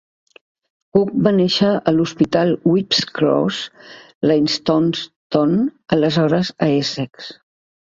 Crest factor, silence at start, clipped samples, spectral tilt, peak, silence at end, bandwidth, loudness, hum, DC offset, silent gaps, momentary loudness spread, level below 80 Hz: 16 dB; 0.95 s; under 0.1%; -6 dB/octave; -2 dBFS; 0.6 s; 7.8 kHz; -17 LUFS; none; under 0.1%; 4.15-4.21 s, 5.16-5.30 s; 10 LU; -56 dBFS